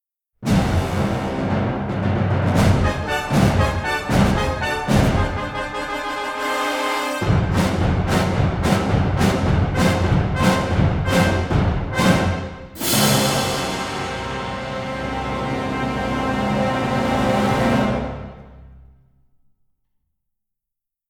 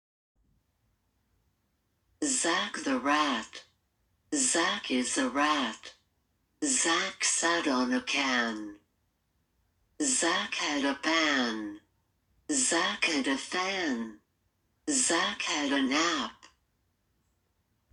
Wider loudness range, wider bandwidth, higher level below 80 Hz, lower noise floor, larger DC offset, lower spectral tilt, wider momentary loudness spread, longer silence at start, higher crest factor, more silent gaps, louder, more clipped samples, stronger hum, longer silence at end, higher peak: first, 5 LU vs 2 LU; first, over 20 kHz vs 10.5 kHz; first, -32 dBFS vs -70 dBFS; first, -83 dBFS vs -76 dBFS; neither; first, -5.5 dB/octave vs -0.5 dB/octave; about the same, 8 LU vs 10 LU; second, 0.4 s vs 2.2 s; about the same, 18 dB vs 20 dB; neither; first, -20 LUFS vs -28 LUFS; neither; neither; first, 2.3 s vs 1.6 s; first, -2 dBFS vs -12 dBFS